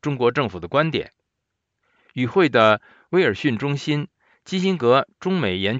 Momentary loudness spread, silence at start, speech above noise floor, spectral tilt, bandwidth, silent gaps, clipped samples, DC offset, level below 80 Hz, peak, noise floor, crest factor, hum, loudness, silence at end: 11 LU; 0.05 s; 59 dB; -6.5 dB/octave; 8 kHz; none; under 0.1%; under 0.1%; -60 dBFS; -2 dBFS; -79 dBFS; 20 dB; none; -21 LUFS; 0 s